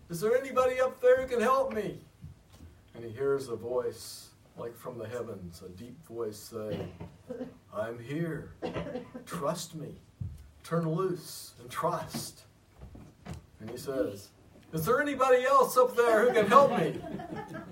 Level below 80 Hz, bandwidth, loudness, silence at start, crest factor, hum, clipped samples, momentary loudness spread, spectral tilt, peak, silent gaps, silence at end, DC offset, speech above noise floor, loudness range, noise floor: -60 dBFS; 16 kHz; -29 LUFS; 0.1 s; 24 dB; none; under 0.1%; 21 LU; -5.5 dB/octave; -6 dBFS; none; 0 s; under 0.1%; 24 dB; 14 LU; -54 dBFS